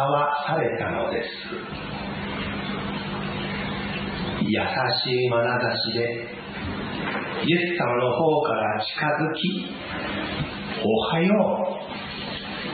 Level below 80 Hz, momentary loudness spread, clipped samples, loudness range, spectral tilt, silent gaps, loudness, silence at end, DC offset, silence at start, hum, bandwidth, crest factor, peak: -50 dBFS; 10 LU; under 0.1%; 5 LU; -10.5 dB/octave; none; -25 LUFS; 0 s; under 0.1%; 0 s; none; 4.8 kHz; 18 dB; -8 dBFS